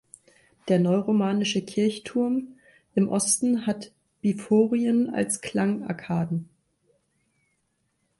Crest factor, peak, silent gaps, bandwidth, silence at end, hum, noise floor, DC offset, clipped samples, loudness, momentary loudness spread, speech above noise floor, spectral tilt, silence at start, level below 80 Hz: 16 dB; -10 dBFS; none; 12 kHz; 1.75 s; none; -73 dBFS; under 0.1%; under 0.1%; -25 LUFS; 9 LU; 49 dB; -5 dB/octave; 0.65 s; -66 dBFS